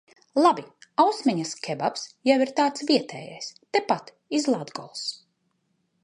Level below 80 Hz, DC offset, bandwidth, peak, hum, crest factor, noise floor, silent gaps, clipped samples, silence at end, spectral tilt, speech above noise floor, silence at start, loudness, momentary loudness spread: -76 dBFS; under 0.1%; 11 kHz; -6 dBFS; none; 20 dB; -73 dBFS; none; under 0.1%; 0.9 s; -4 dB/octave; 48 dB; 0.35 s; -25 LUFS; 14 LU